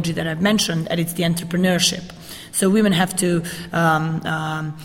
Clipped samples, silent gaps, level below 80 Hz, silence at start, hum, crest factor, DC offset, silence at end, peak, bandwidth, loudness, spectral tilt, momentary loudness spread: under 0.1%; none; -50 dBFS; 0 s; none; 16 dB; under 0.1%; 0 s; -4 dBFS; 16.5 kHz; -19 LUFS; -4.5 dB/octave; 9 LU